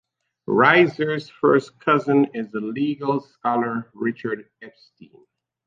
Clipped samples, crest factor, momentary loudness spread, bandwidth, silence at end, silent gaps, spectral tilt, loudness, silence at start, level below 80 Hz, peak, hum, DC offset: under 0.1%; 20 dB; 13 LU; 7.6 kHz; 0.95 s; none; -7.5 dB/octave; -21 LUFS; 0.5 s; -68 dBFS; -2 dBFS; none; under 0.1%